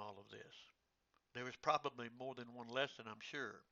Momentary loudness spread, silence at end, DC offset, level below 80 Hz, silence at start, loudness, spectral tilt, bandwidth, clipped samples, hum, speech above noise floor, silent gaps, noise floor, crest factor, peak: 18 LU; 0.1 s; under 0.1%; -86 dBFS; 0 s; -45 LUFS; -1.5 dB/octave; 7.4 kHz; under 0.1%; none; 37 dB; none; -83 dBFS; 24 dB; -24 dBFS